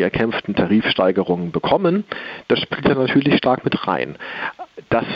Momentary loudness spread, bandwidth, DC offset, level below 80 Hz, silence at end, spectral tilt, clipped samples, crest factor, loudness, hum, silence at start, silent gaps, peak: 11 LU; 6 kHz; under 0.1%; -48 dBFS; 0 s; -8.5 dB/octave; under 0.1%; 16 dB; -19 LUFS; none; 0 s; none; -4 dBFS